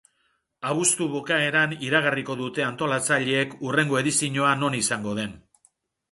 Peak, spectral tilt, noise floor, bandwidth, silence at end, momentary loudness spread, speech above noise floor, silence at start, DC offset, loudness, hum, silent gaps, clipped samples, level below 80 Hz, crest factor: -6 dBFS; -3 dB/octave; -71 dBFS; 12 kHz; 0.75 s; 7 LU; 47 dB; 0.6 s; under 0.1%; -23 LUFS; none; none; under 0.1%; -64 dBFS; 20 dB